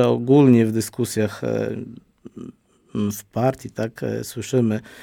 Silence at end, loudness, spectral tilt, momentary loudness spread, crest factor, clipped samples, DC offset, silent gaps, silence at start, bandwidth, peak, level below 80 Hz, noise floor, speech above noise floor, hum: 0 s; -21 LUFS; -7 dB/octave; 22 LU; 18 dB; under 0.1%; under 0.1%; none; 0 s; 18 kHz; -4 dBFS; -58 dBFS; -44 dBFS; 24 dB; none